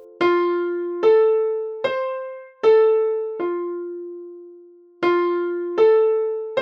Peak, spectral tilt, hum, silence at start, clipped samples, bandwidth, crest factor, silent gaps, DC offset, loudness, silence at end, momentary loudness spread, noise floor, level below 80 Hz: -6 dBFS; -6 dB/octave; none; 0 s; under 0.1%; 5.8 kHz; 14 dB; none; under 0.1%; -20 LUFS; 0 s; 16 LU; -47 dBFS; -76 dBFS